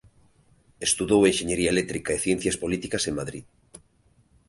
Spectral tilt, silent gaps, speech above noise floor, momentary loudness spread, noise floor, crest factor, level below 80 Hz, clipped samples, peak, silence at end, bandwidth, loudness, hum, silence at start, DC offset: -3.5 dB/octave; none; 38 dB; 10 LU; -62 dBFS; 20 dB; -50 dBFS; under 0.1%; -6 dBFS; 0.7 s; 11.5 kHz; -24 LUFS; none; 0.8 s; under 0.1%